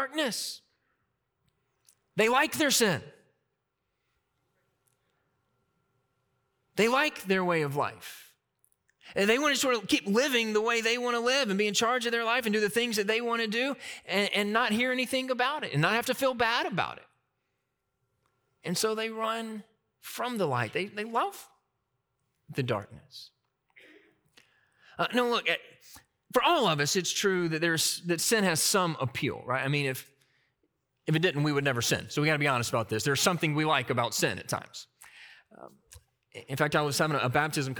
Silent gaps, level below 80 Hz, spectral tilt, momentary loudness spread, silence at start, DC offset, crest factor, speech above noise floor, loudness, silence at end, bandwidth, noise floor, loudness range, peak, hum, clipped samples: none; -70 dBFS; -3.5 dB/octave; 11 LU; 0 s; under 0.1%; 22 dB; 53 dB; -28 LUFS; 0 s; over 20 kHz; -81 dBFS; 8 LU; -8 dBFS; none; under 0.1%